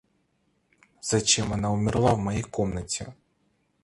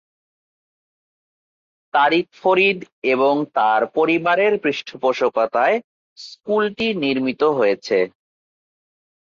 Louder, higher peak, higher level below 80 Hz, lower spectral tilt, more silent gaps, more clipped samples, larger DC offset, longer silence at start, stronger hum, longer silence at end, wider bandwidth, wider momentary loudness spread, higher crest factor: second, -26 LUFS vs -19 LUFS; second, -8 dBFS vs -4 dBFS; first, -46 dBFS vs -66 dBFS; second, -4 dB/octave vs -5.5 dB/octave; second, none vs 2.92-3.02 s, 5.84-6.16 s; neither; neither; second, 1.05 s vs 1.95 s; neither; second, 0.7 s vs 1.3 s; first, 11.5 kHz vs 7.4 kHz; first, 11 LU vs 7 LU; about the same, 20 dB vs 16 dB